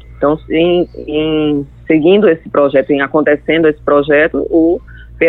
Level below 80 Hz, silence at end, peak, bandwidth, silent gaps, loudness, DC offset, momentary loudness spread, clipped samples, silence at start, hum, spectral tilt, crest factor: -38 dBFS; 0 s; 0 dBFS; 4.4 kHz; none; -12 LUFS; under 0.1%; 6 LU; under 0.1%; 0.1 s; none; -9 dB/octave; 12 dB